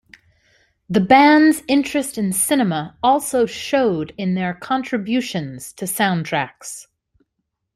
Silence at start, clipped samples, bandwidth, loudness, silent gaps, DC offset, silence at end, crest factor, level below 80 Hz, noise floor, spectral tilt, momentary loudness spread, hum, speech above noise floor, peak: 0.9 s; under 0.1%; 15.5 kHz; -18 LUFS; none; under 0.1%; 0.95 s; 18 dB; -58 dBFS; -76 dBFS; -4.5 dB/octave; 15 LU; none; 58 dB; -2 dBFS